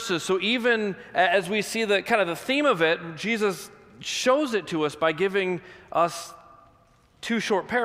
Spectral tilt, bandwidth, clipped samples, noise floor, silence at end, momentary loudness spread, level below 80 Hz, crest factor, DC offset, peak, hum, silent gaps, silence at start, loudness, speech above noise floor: -3.5 dB/octave; 16 kHz; under 0.1%; -59 dBFS; 0 s; 9 LU; -66 dBFS; 18 dB; under 0.1%; -6 dBFS; none; none; 0 s; -24 LUFS; 34 dB